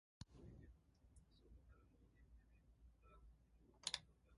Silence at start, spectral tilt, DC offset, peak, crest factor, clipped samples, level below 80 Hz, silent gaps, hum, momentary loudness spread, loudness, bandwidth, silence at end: 0.2 s; -1.5 dB/octave; under 0.1%; -26 dBFS; 34 dB; under 0.1%; -70 dBFS; none; none; 21 LU; -51 LUFS; 11 kHz; 0 s